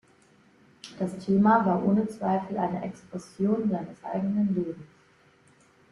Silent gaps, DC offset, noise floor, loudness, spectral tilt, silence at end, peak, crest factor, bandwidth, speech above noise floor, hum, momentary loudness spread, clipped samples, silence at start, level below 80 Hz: none; under 0.1%; -60 dBFS; -27 LUFS; -8.5 dB/octave; 1.05 s; -8 dBFS; 20 dB; 11 kHz; 34 dB; none; 19 LU; under 0.1%; 0.85 s; -66 dBFS